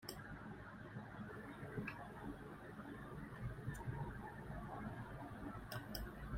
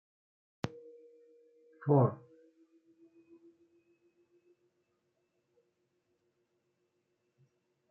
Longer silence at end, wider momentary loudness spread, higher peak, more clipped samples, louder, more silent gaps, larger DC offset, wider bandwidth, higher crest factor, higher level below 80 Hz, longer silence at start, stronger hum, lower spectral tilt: second, 0 s vs 5.75 s; second, 5 LU vs 26 LU; second, -30 dBFS vs -14 dBFS; neither; second, -51 LUFS vs -33 LUFS; neither; neither; first, 16 kHz vs 7 kHz; second, 20 dB vs 26 dB; first, -60 dBFS vs -80 dBFS; second, 0 s vs 0.65 s; neither; second, -6 dB/octave vs -9 dB/octave